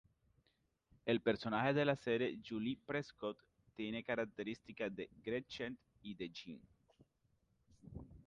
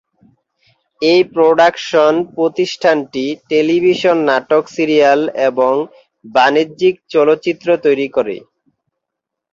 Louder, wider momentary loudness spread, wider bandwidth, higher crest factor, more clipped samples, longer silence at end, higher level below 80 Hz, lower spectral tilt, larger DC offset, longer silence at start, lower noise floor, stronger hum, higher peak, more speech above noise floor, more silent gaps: second, -41 LUFS vs -14 LUFS; first, 19 LU vs 7 LU; first, 9 kHz vs 7.6 kHz; first, 20 dB vs 14 dB; neither; second, 0.05 s vs 1.15 s; second, -70 dBFS vs -60 dBFS; first, -6.5 dB/octave vs -5 dB/octave; neither; about the same, 1.05 s vs 1 s; about the same, -81 dBFS vs -80 dBFS; neither; second, -22 dBFS vs 0 dBFS; second, 40 dB vs 66 dB; neither